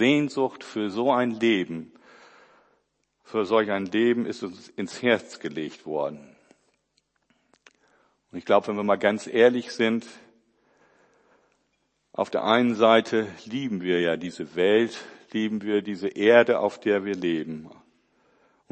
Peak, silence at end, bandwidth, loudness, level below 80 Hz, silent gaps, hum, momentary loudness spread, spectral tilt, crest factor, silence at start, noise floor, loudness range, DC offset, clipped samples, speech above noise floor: -4 dBFS; 1.05 s; 8.8 kHz; -24 LUFS; -74 dBFS; none; none; 15 LU; -5.5 dB/octave; 22 dB; 0 s; -73 dBFS; 7 LU; under 0.1%; under 0.1%; 49 dB